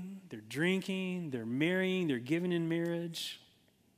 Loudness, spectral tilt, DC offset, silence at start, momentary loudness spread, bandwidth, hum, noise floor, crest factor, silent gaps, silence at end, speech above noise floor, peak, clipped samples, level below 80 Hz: -34 LUFS; -6 dB/octave; under 0.1%; 0 s; 11 LU; 15.5 kHz; none; -68 dBFS; 18 dB; none; 0.6 s; 34 dB; -16 dBFS; under 0.1%; -80 dBFS